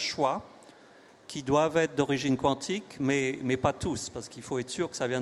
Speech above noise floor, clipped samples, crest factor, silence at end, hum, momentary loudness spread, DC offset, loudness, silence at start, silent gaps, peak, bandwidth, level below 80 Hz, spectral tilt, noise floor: 26 dB; under 0.1%; 20 dB; 0 s; none; 10 LU; under 0.1%; -29 LUFS; 0 s; none; -8 dBFS; 12 kHz; -58 dBFS; -4.5 dB/octave; -55 dBFS